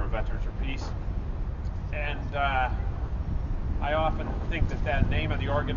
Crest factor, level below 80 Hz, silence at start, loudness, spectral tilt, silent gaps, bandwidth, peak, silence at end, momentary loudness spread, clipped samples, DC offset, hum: 20 dB; -30 dBFS; 0 s; -30 LUFS; -7.5 dB/octave; none; 7.2 kHz; -8 dBFS; 0 s; 8 LU; under 0.1%; under 0.1%; none